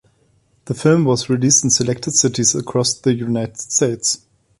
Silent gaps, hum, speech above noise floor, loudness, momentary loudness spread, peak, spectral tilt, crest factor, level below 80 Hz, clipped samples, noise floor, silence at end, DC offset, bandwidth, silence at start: none; none; 42 dB; -16 LUFS; 8 LU; -2 dBFS; -4 dB/octave; 16 dB; -52 dBFS; under 0.1%; -59 dBFS; 0.45 s; under 0.1%; 11.5 kHz; 0.65 s